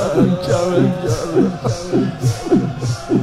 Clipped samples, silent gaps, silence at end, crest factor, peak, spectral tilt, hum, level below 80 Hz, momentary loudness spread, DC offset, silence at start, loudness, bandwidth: under 0.1%; none; 0 s; 14 dB; -2 dBFS; -7 dB/octave; none; -42 dBFS; 5 LU; under 0.1%; 0 s; -17 LUFS; 14.5 kHz